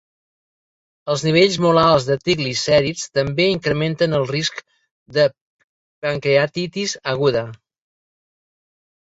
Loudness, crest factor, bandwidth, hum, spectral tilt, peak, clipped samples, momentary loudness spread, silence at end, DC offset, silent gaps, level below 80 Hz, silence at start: -18 LUFS; 18 dB; 8 kHz; none; -5 dB/octave; -2 dBFS; under 0.1%; 10 LU; 1.5 s; under 0.1%; 4.91-5.06 s, 5.41-6.02 s; -52 dBFS; 1.05 s